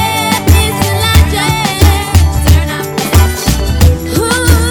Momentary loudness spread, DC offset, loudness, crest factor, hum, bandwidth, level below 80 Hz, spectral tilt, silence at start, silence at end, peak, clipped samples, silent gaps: 4 LU; under 0.1%; -10 LUFS; 10 dB; none; over 20 kHz; -14 dBFS; -4.5 dB/octave; 0 s; 0 s; 0 dBFS; 3%; none